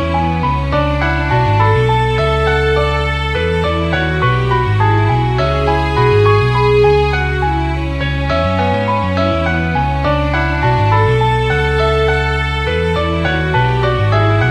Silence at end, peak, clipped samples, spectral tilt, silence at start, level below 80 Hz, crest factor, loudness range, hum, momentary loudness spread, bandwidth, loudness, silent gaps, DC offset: 0 s; 0 dBFS; under 0.1%; -7 dB/octave; 0 s; -22 dBFS; 14 dB; 2 LU; none; 4 LU; 10 kHz; -14 LUFS; none; under 0.1%